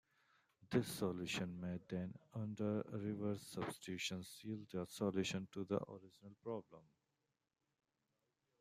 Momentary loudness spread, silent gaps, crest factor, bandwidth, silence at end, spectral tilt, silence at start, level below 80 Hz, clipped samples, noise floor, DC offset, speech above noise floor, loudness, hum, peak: 9 LU; none; 24 dB; 15.5 kHz; 1.8 s; -5.5 dB/octave; 0.6 s; -78 dBFS; under 0.1%; -88 dBFS; under 0.1%; 44 dB; -45 LUFS; none; -22 dBFS